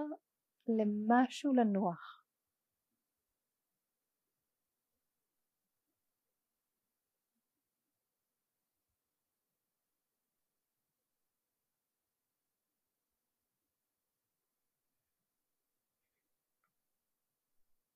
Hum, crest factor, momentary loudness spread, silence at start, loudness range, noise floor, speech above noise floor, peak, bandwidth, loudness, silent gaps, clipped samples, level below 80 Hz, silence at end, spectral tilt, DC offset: none; 26 dB; 16 LU; 0 s; 7 LU; under -90 dBFS; over 57 dB; -18 dBFS; 10 kHz; -33 LUFS; none; under 0.1%; under -90 dBFS; 15.85 s; -6.5 dB/octave; under 0.1%